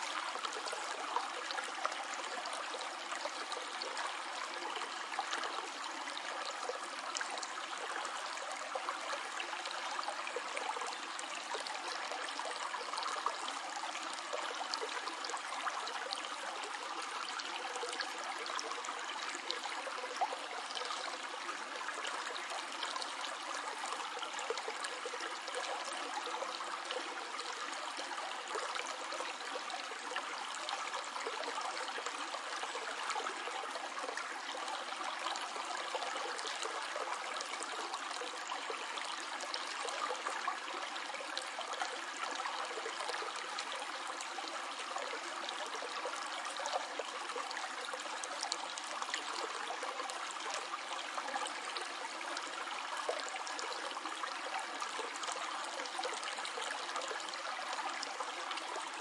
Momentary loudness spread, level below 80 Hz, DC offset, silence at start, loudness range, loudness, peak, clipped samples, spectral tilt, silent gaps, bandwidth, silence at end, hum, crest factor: 2 LU; under -90 dBFS; under 0.1%; 0 s; 1 LU; -40 LUFS; -14 dBFS; under 0.1%; 1.5 dB/octave; none; 12 kHz; 0 s; none; 26 dB